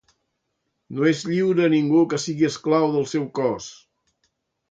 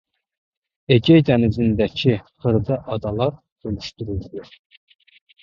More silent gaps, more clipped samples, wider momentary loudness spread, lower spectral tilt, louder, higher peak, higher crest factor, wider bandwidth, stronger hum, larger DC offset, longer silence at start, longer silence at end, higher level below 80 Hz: second, none vs 3.52-3.56 s; neither; second, 7 LU vs 16 LU; second, -6 dB/octave vs -8 dB/octave; about the same, -21 LUFS vs -20 LUFS; second, -6 dBFS vs -2 dBFS; about the same, 16 dB vs 20 dB; first, 8.8 kHz vs 7.2 kHz; neither; neither; about the same, 0.9 s vs 0.9 s; about the same, 0.95 s vs 1 s; second, -66 dBFS vs -42 dBFS